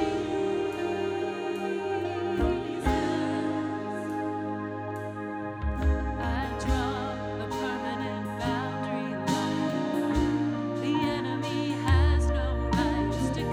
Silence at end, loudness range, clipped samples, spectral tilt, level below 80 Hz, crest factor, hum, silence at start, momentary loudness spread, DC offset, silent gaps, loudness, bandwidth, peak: 0 s; 4 LU; under 0.1%; -6.5 dB/octave; -36 dBFS; 16 dB; none; 0 s; 6 LU; under 0.1%; none; -29 LUFS; 13.5 kHz; -12 dBFS